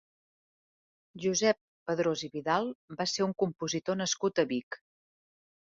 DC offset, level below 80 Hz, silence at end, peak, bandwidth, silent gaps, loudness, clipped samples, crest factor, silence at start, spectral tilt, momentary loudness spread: under 0.1%; -72 dBFS; 0.9 s; -14 dBFS; 7.8 kHz; 1.61-1.86 s, 2.75-2.88 s, 4.63-4.71 s; -31 LUFS; under 0.1%; 20 dB; 1.15 s; -3.5 dB/octave; 8 LU